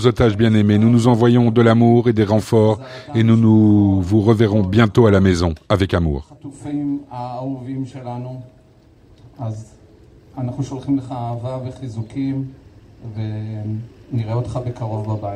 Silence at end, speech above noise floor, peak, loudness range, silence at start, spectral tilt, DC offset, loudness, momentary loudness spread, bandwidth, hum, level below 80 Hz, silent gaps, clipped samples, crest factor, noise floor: 0 s; 33 dB; 0 dBFS; 14 LU; 0 s; -8 dB/octave; under 0.1%; -17 LUFS; 16 LU; 10.5 kHz; none; -40 dBFS; none; under 0.1%; 16 dB; -49 dBFS